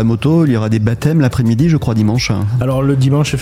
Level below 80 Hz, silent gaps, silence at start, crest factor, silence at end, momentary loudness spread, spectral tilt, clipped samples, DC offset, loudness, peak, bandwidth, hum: -34 dBFS; none; 0 s; 10 dB; 0 s; 3 LU; -7 dB/octave; under 0.1%; 0.4%; -13 LUFS; -2 dBFS; 15 kHz; none